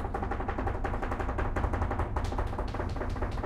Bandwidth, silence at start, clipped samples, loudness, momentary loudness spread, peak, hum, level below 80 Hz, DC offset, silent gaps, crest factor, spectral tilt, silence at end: 11 kHz; 0 s; under 0.1%; -34 LUFS; 3 LU; -16 dBFS; none; -34 dBFS; under 0.1%; none; 16 dB; -7.5 dB/octave; 0 s